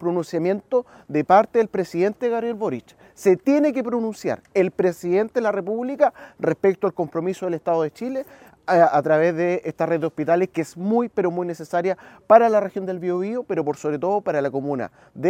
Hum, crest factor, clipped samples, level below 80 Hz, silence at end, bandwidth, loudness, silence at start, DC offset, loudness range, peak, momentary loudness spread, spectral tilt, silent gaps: none; 22 dB; under 0.1%; -66 dBFS; 0 s; 15.5 kHz; -22 LUFS; 0 s; under 0.1%; 2 LU; 0 dBFS; 10 LU; -7 dB/octave; none